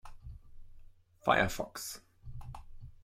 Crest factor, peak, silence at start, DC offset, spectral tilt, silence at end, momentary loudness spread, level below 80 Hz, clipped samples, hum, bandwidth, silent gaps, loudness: 26 dB; -12 dBFS; 0.05 s; under 0.1%; -4 dB/octave; 0 s; 25 LU; -52 dBFS; under 0.1%; none; 16.5 kHz; none; -33 LUFS